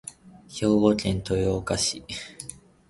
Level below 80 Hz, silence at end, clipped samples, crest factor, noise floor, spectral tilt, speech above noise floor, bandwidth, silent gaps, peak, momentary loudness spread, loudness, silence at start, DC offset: -46 dBFS; 0.35 s; under 0.1%; 22 dB; -45 dBFS; -5 dB/octave; 20 dB; 11.5 kHz; none; -6 dBFS; 19 LU; -25 LUFS; 0.05 s; under 0.1%